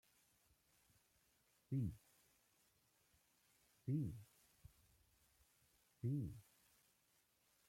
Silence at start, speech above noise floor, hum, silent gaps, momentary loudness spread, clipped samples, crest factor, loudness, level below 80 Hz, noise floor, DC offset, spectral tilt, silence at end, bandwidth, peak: 1.7 s; 36 dB; none; none; 16 LU; under 0.1%; 20 dB; -47 LUFS; -74 dBFS; -80 dBFS; under 0.1%; -8.5 dB/octave; 1.25 s; 16.5 kHz; -32 dBFS